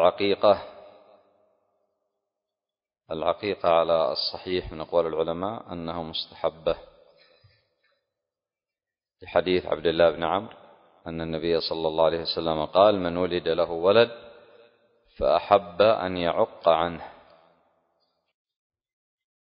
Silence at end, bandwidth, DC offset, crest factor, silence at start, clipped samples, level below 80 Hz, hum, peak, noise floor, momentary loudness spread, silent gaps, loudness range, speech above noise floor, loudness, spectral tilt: 2.3 s; 5.4 kHz; under 0.1%; 24 dB; 0 s; under 0.1%; -54 dBFS; none; -2 dBFS; under -90 dBFS; 13 LU; none; 9 LU; over 66 dB; -25 LUFS; -9.5 dB/octave